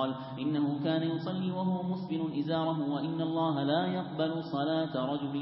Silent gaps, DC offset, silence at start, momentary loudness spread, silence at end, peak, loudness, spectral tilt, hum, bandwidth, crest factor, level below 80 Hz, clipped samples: none; under 0.1%; 0 s; 4 LU; 0 s; -16 dBFS; -32 LUFS; -11 dB/octave; none; 5.8 kHz; 14 dB; -70 dBFS; under 0.1%